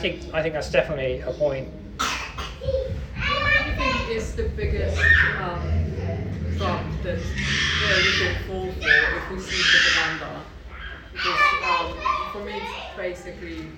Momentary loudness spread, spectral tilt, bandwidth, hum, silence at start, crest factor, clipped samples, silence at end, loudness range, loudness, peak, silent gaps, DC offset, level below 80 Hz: 15 LU; -4 dB/octave; 17.5 kHz; none; 0 s; 20 dB; under 0.1%; 0 s; 5 LU; -22 LUFS; -4 dBFS; none; under 0.1%; -34 dBFS